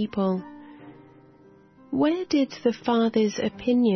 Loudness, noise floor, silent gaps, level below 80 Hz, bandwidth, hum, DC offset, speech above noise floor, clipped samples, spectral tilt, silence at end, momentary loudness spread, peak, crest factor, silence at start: -25 LUFS; -53 dBFS; none; -62 dBFS; 6.4 kHz; none; under 0.1%; 30 dB; under 0.1%; -6 dB/octave; 0 s; 14 LU; -10 dBFS; 14 dB; 0 s